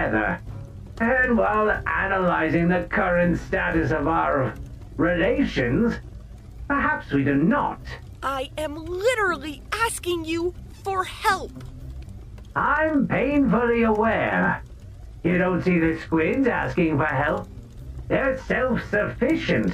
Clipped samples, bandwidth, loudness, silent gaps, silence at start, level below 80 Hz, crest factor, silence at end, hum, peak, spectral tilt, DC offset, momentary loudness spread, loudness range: under 0.1%; 15 kHz; -23 LUFS; none; 0 s; -40 dBFS; 16 dB; 0 s; none; -6 dBFS; -6.5 dB/octave; under 0.1%; 18 LU; 4 LU